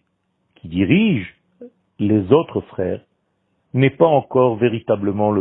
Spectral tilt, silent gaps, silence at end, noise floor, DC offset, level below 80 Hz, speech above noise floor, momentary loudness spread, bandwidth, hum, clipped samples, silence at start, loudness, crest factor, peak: -12 dB/octave; none; 0 s; -68 dBFS; under 0.1%; -54 dBFS; 52 dB; 11 LU; 4 kHz; none; under 0.1%; 0.65 s; -18 LUFS; 18 dB; 0 dBFS